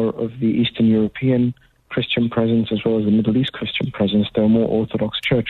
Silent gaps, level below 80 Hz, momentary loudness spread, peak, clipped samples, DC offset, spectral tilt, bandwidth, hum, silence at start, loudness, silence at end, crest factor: none; -48 dBFS; 6 LU; -6 dBFS; under 0.1%; under 0.1%; -8.5 dB/octave; 4.4 kHz; none; 0 s; -19 LUFS; 0 s; 12 dB